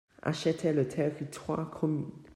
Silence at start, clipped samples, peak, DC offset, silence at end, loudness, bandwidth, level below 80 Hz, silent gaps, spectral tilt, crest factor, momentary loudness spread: 0.25 s; under 0.1%; -16 dBFS; under 0.1%; 0 s; -32 LUFS; 13 kHz; -64 dBFS; none; -6.5 dB/octave; 16 dB; 6 LU